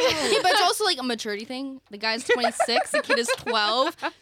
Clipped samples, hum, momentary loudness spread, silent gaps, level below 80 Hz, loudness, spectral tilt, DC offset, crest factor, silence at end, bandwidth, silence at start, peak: under 0.1%; none; 11 LU; none; -66 dBFS; -23 LUFS; -1.5 dB/octave; under 0.1%; 14 dB; 0.1 s; 18 kHz; 0 s; -10 dBFS